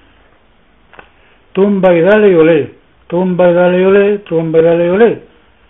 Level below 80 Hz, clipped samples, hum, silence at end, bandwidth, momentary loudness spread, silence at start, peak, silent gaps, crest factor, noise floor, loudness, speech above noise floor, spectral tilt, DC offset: -48 dBFS; under 0.1%; none; 0.5 s; 3.9 kHz; 9 LU; 1.55 s; 0 dBFS; none; 12 dB; -49 dBFS; -10 LUFS; 41 dB; -10.5 dB/octave; under 0.1%